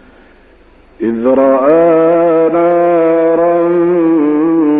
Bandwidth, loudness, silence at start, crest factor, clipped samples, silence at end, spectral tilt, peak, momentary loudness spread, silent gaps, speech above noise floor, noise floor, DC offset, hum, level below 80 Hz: 3.7 kHz; -10 LUFS; 1 s; 10 dB; under 0.1%; 0 s; -11 dB/octave; 0 dBFS; 3 LU; none; 34 dB; -43 dBFS; under 0.1%; none; -48 dBFS